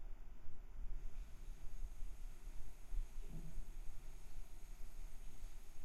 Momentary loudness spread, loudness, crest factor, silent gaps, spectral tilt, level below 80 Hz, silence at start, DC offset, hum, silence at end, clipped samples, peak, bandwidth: 6 LU; -57 LUFS; 12 dB; none; -5 dB/octave; -48 dBFS; 0 s; under 0.1%; none; 0 s; under 0.1%; -30 dBFS; 12.5 kHz